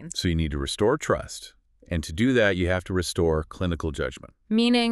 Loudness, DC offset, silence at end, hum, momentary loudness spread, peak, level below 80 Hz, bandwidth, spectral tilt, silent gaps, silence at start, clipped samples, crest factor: -25 LUFS; under 0.1%; 0 s; none; 11 LU; -6 dBFS; -40 dBFS; 13 kHz; -5 dB/octave; none; 0 s; under 0.1%; 18 dB